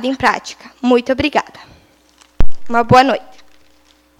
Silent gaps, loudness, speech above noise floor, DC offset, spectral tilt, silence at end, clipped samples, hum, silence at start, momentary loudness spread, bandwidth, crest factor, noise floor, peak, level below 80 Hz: none; -15 LUFS; 37 dB; under 0.1%; -5.5 dB/octave; 1 s; 0.4%; none; 0 s; 15 LU; 10 kHz; 14 dB; -52 dBFS; 0 dBFS; -26 dBFS